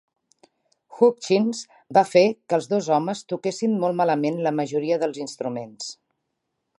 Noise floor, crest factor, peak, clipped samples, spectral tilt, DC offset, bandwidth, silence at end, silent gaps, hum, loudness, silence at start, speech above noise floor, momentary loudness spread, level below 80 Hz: -78 dBFS; 20 dB; -4 dBFS; under 0.1%; -5.5 dB/octave; under 0.1%; 11.5 kHz; 0.85 s; none; none; -22 LUFS; 0.9 s; 56 dB; 12 LU; -76 dBFS